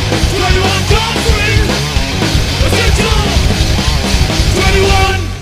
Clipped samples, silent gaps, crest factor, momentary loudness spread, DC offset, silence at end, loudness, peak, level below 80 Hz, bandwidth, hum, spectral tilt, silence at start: under 0.1%; none; 10 dB; 3 LU; under 0.1%; 0 s; -11 LUFS; 0 dBFS; -16 dBFS; 16 kHz; none; -4.5 dB/octave; 0 s